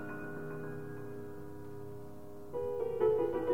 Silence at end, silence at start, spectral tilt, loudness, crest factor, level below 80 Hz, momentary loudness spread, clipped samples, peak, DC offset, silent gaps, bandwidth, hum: 0 s; 0 s; -8 dB/octave; -38 LUFS; 18 dB; -64 dBFS; 17 LU; under 0.1%; -20 dBFS; 0.4%; none; 16 kHz; none